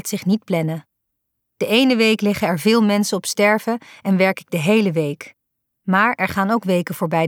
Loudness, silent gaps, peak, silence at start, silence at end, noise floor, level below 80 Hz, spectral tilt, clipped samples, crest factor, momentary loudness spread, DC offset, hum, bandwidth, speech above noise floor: -18 LUFS; none; -2 dBFS; 0.05 s; 0 s; -76 dBFS; -58 dBFS; -5 dB/octave; under 0.1%; 16 dB; 10 LU; under 0.1%; none; 18.5 kHz; 58 dB